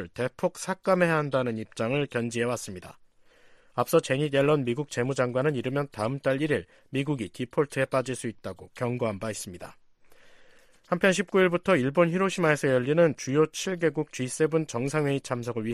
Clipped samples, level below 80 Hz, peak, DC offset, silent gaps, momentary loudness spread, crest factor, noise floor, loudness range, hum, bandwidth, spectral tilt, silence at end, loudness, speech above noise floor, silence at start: under 0.1%; -64 dBFS; -8 dBFS; under 0.1%; none; 10 LU; 18 dB; -57 dBFS; 7 LU; none; 15 kHz; -5.5 dB/octave; 0 s; -27 LUFS; 30 dB; 0 s